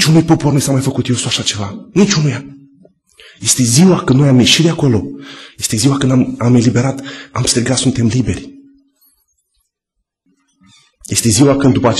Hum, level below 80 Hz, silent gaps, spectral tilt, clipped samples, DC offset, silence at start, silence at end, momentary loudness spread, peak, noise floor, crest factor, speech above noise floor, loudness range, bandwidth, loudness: none; -42 dBFS; none; -4.5 dB/octave; under 0.1%; under 0.1%; 0 s; 0 s; 12 LU; 0 dBFS; -74 dBFS; 14 dB; 62 dB; 7 LU; 13 kHz; -12 LUFS